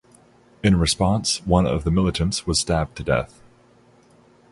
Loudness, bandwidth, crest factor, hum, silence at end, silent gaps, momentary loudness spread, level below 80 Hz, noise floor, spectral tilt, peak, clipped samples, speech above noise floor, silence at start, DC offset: -21 LUFS; 11.5 kHz; 20 dB; 60 Hz at -50 dBFS; 1.25 s; none; 5 LU; -34 dBFS; -54 dBFS; -5 dB/octave; -4 dBFS; under 0.1%; 34 dB; 0.65 s; under 0.1%